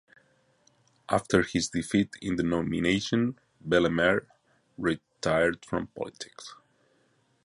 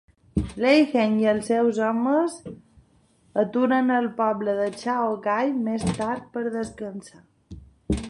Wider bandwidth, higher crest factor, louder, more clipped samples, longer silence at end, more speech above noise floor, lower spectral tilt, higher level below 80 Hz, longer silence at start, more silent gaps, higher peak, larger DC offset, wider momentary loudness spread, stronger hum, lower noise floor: about the same, 11.5 kHz vs 11.5 kHz; about the same, 22 dB vs 18 dB; second, -28 LUFS vs -24 LUFS; neither; first, 0.9 s vs 0 s; about the same, 41 dB vs 38 dB; about the same, -5 dB/octave vs -6 dB/octave; second, -54 dBFS vs -44 dBFS; first, 1.1 s vs 0.35 s; neither; about the same, -8 dBFS vs -6 dBFS; neither; about the same, 13 LU vs 11 LU; neither; first, -68 dBFS vs -60 dBFS